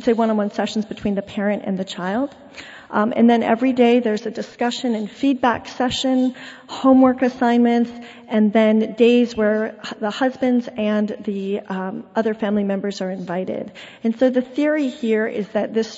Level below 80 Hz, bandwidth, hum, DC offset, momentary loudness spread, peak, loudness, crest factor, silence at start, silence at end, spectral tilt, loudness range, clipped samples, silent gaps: -58 dBFS; 8 kHz; none; under 0.1%; 11 LU; -4 dBFS; -20 LUFS; 16 dB; 0 s; 0 s; -6 dB/octave; 5 LU; under 0.1%; none